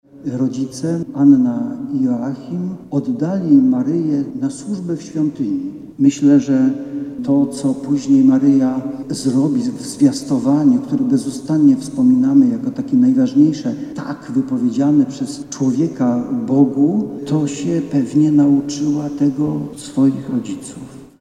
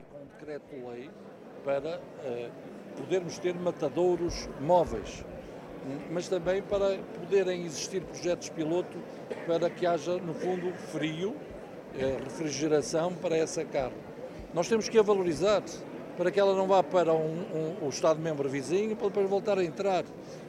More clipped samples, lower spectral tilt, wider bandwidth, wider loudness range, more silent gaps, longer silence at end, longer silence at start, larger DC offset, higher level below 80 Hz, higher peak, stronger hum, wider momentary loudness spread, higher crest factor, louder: neither; first, -7 dB/octave vs -5 dB/octave; second, 10.5 kHz vs 13.5 kHz; about the same, 3 LU vs 5 LU; neither; first, 0.15 s vs 0 s; first, 0.15 s vs 0 s; neither; about the same, -56 dBFS vs -58 dBFS; first, 0 dBFS vs -12 dBFS; neither; second, 12 LU vs 16 LU; second, 14 dB vs 20 dB; first, -16 LUFS vs -30 LUFS